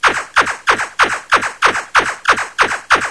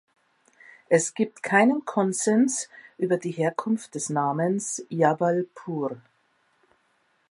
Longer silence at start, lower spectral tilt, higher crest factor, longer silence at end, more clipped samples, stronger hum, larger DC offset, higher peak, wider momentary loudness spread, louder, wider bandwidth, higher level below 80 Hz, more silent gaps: second, 0 s vs 0.9 s; second, -1 dB/octave vs -5 dB/octave; about the same, 16 dB vs 20 dB; second, 0 s vs 1.3 s; neither; neither; first, 0.2% vs under 0.1%; first, 0 dBFS vs -6 dBFS; second, 3 LU vs 10 LU; first, -14 LUFS vs -25 LUFS; about the same, 11 kHz vs 11.5 kHz; first, -44 dBFS vs -78 dBFS; neither